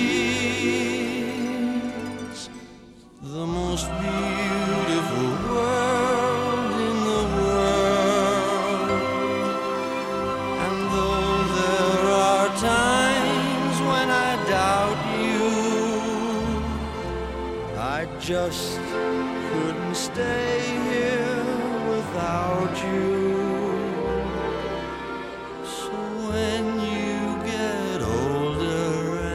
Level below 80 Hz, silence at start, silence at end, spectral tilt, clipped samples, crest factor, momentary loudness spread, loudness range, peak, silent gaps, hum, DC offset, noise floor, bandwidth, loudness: -42 dBFS; 0 s; 0 s; -4.5 dB/octave; under 0.1%; 18 dB; 9 LU; 7 LU; -6 dBFS; none; none; under 0.1%; -47 dBFS; 16 kHz; -24 LUFS